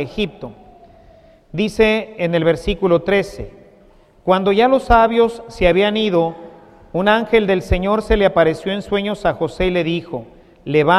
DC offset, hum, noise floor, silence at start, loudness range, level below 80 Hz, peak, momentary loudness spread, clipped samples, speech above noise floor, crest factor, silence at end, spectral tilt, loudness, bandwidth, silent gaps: under 0.1%; none; -49 dBFS; 0 s; 3 LU; -32 dBFS; 0 dBFS; 15 LU; under 0.1%; 33 dB; 16 dB; 0 s; -6.5 dB/octave; -17 LUFS; 13 kHz; none